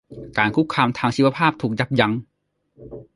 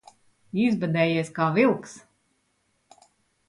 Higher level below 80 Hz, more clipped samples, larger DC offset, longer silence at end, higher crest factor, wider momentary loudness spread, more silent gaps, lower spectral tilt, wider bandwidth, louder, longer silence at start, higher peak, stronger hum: first, -54 dBFS vs -68 dBFS; neither; neither; second, 0.15 s vs 1.5 s; about the same, 20 dB vs 20 dB; about the same, 11 LU vs 11 LU; neither; about the same, -6.5 dB/octave vs -6.5 dB/octave; about the same, 11.5 kHz vs 11.5 kHz; first, -20 LUFS vs -24 LUFS; second, 0.1 s vs 0.55 s; first, -2 dBFS vs -8 dBFS; neither